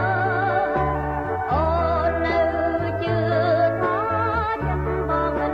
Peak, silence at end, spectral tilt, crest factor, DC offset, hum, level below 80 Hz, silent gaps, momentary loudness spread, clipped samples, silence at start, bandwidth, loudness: -8 dBFS; 0 s; -8.5 dB/octave; 14 dB; under 0.1%; none; -34 dBFS; none; 4 LU; under 0.1%; 0 s; 6.8 kHz; -22 LUFS